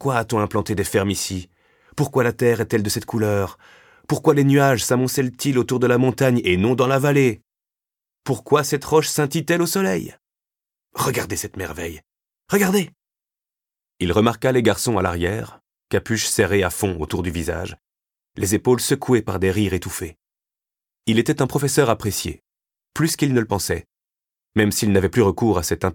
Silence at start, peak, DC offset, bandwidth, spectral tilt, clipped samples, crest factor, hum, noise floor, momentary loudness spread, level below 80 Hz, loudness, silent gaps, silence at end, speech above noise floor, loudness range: 0 s; -4 dBFS; under 0.1%; 19 kHz; -5 dB/octave; under 0.1%; 18 dB; none; -90 dBFS; 12 LU; -46 dBFS; -20 LUFS; none; 0 s; 70 dB; 5 LU